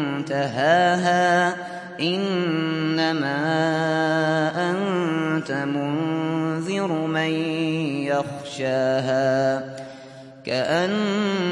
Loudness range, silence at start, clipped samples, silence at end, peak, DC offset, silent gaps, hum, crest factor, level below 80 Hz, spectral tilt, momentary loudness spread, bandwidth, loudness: 3 LU; 0 s; under 0.1%; 0 s; -6 dBFS; under 0.1%; none; none; 16 dB; -70 dBFS; -5.5 dB/octave; 8 LU; 11.5 kHz; -22 LUFS